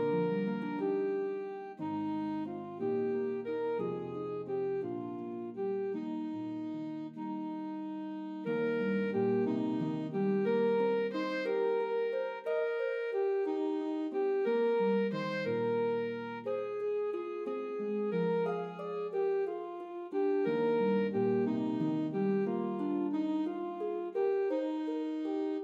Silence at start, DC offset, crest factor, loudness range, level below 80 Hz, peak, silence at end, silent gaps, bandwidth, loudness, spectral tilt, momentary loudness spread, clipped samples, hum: 0 s; under 0.1%; 12 dB; 5 LU; -88 dBFS; -20 dBFS; 0 s; none; 7.2 kHz; -34 LUFS; -8.5 dB/octave; 9 LU; under 0.1%; none